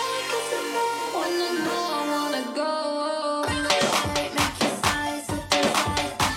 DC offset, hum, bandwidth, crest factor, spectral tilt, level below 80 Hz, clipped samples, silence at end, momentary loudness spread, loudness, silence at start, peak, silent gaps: under 0.1%; none; 16.5 kHz; 20 dB; -3 dB/octave; -48 dBFS; under 0.1%; 0 s; 5 LU; -25 LUFS; 0 s; -6 dBFS; none